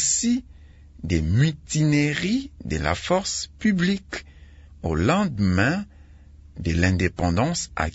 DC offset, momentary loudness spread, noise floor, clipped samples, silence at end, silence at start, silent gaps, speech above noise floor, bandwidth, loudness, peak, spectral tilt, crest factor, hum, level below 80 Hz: under 0.1%; 10 LU; -47 dBFS; under 0.1%; 0 s; 0 s; none; 25 dB; 8 kHz; -23 LUFS; -6 dBFS; -5 dB/octave; 18 dB; none; -42 dBFS